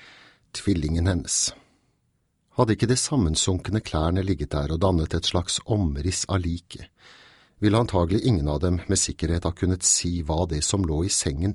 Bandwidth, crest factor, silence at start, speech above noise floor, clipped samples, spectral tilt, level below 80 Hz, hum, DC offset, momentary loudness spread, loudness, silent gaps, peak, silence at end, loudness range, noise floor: 12 kHz; 18 dB; 0.55 s; 47 dB; under 0.1%; -4.5 dB/octave; -36 dBFS; none; under 0.1%; 5 LU; -24 LUFS; none; -6 dBFS; 0 s; 3 LU; -70 dBFS